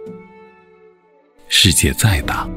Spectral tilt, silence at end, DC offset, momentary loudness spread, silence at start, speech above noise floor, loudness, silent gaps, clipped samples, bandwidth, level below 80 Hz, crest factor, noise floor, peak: -3 dB/octave; 0 s; under 0.1%; 9 LU; 0 s; 38 dB; -13 LUFS; none; under 0.1%; 16.5 kHz; -30 dBFS; 18 dB; -52 dBFS; 0 dBFS